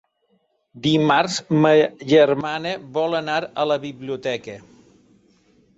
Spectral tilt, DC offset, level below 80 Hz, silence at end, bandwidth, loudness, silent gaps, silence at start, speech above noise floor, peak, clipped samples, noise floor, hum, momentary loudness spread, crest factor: -5.5 dB/octave; under 0.1%; -62 dBFS; 1.15 s; 8 kHz; -20 LUFS; none; 0.75 s; 47 dB; -4 dBFS; under 0.1%; -66 dBFS; none; 12 LU; 18 dB